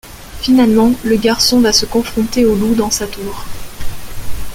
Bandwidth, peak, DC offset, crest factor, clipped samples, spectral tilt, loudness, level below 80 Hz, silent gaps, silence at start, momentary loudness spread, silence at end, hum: 17 kHz; 0 dBFS; under 0.1%; 14 dB; under 0.1%; -4 dB/octave; -13 LUFS; -30 dBFS; none; 0.05 s; 20 LU; 0 s; none